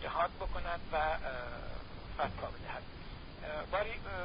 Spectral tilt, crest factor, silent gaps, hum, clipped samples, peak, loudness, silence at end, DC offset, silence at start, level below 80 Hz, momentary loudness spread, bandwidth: -3 dB/octave; 18 dB; none; none; under 0.1%; -22 dBFS; -39 LUFS; 0 s; under 0.1%; 0 s; -48 dBFS; 12 LU; 5 kHz